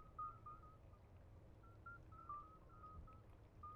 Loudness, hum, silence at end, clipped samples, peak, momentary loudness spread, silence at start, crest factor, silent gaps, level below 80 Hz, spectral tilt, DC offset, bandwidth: -59 LUFS; none; 0 s; under 0.1%; -42 dBFS; 12 LU; 0 s; 16 dB; none; -66 dBFS; -7 dB/octave; under 0.1%; 6.6 kHz